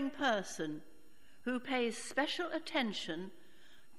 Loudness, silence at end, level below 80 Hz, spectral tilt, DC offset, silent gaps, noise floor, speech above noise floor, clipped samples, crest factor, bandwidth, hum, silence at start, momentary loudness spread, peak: -37 LUFS; 0.25 s; -74 dBFS; -3.5 dB/octave; 0.3%; none; -66 dBFS; 29 dB; under 0.1%; 20 dB; 14.5 kHz; none; 0 s; 11 LU; -20 dBFS